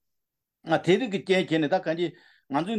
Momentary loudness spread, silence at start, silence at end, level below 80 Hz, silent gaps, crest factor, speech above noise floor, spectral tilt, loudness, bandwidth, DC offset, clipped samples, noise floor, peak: 8 LU; 0.65 s; 0 s; -74 dBFS; none; 18 dB; 59 dB; -6 dB/octave; -26 LUFS; 10.5 kHz; under 0.1%; under 0.1%; -84 dBFS; -10 dBFS